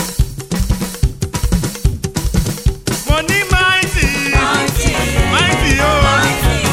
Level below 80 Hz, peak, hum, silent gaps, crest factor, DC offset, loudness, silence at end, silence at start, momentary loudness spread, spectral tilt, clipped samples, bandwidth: -20 dBFS; 0 dBFS; none; none; 14 dB; under 0.1%; -14 LUFS; 0 s; 0 s; 8 LU; -4 dB/octave; under 0.1%; 17 kHz